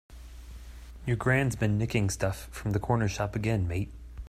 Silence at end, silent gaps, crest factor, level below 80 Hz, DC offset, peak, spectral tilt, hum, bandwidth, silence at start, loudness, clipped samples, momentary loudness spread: 0 s; none; 18 dB; -44 dBFS; under 0.1%; -12 dBFS; -6 dB/octave; none; 15 kHz; 0.1 s; -29 LUFS; under 0.1%; 21 LU